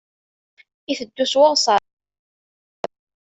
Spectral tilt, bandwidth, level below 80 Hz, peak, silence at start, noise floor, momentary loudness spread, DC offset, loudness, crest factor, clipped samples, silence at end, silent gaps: -1.5 dB/octave; 8.2 kHz; -68 dBFS; -2 dBFS; 0.9 s; under -90 dBFS; 19 LU; under 0.1%; -18 LUFS; 20 dB; under 0.1%; 1.4 s; none